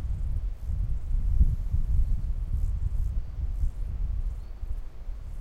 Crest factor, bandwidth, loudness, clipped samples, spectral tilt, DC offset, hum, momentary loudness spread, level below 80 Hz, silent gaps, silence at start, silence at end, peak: 18 dB; 2.5 kHz; -33 LUFS; under 0.1%; -8.5 dB/octave; under 0.1%; none; 12 LU; -28 dBFS; none; 0 s; 0 s; -10 dBFS